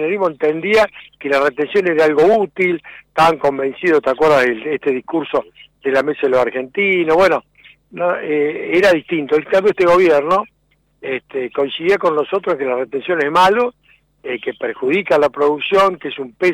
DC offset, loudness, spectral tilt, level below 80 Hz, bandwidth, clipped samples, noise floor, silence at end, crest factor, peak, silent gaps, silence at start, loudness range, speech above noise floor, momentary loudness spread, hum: under 0.1%; -16 LUFS; -5.5 dB/octave; -52 dBFS; 15.5 kHz; under 0.1%; -55 dBFS; 0 s; 10 dB; -6 dBFS; none; 0 s; 2 LU; 39 dB; 11 LU; none